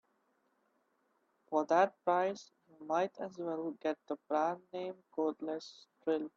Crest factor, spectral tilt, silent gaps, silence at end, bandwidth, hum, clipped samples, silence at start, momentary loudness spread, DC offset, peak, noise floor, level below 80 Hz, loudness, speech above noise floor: 20 dB; -5.5 dB/octave; none; 0.1 s; 7.6 kHz; none; under 0.1%; 1.5 s; 13 LU; under 0.1%; -16 dBFS; -77 dBFS; -88 dBFS; -36 LUFS; 42 dB